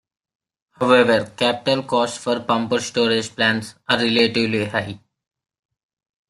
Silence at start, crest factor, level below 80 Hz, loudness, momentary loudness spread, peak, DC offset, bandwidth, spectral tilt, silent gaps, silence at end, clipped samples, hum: 0.8 s; 20 dB; -60 dBFS; -19 LUFS; 9 LU; -2 dBFS; under 0.1%; 12 kHz; -4 dB/octave; none; 1.3 s; under 0.1%; none